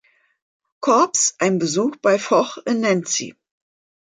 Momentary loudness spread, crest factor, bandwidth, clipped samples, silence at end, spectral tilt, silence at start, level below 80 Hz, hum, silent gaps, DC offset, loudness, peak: 7 LU; 16 dB; 9.6 kHz; under 0.1%; 0.7 s; -3.5 dB/octave; 0.8 s; -70 dBFS; none; none; under 0.1%; -19 LUFS; -4 dBFS